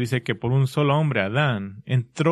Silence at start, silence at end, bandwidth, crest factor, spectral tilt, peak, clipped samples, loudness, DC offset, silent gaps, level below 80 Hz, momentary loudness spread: 0 s; 0 s; 12.5 kHz; 16 dB; -7 dB/octave; -6 dBFS; under 0.1%; -23 LUFS; under 0.1%; none; -58 dBFS; 5 LU